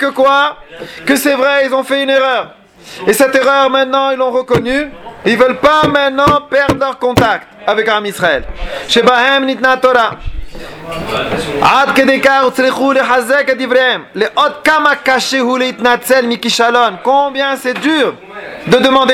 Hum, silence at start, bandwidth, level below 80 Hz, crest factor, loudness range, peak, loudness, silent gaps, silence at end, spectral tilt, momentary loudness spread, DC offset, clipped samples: none; 0 s; 17 kHz; -36 dBFS; 12 dB; 2 LU; 0 dBFS; -11 LUFS; none; 0 s; -4 dB/octave; 9 LU; under 0.1%; under 0.1%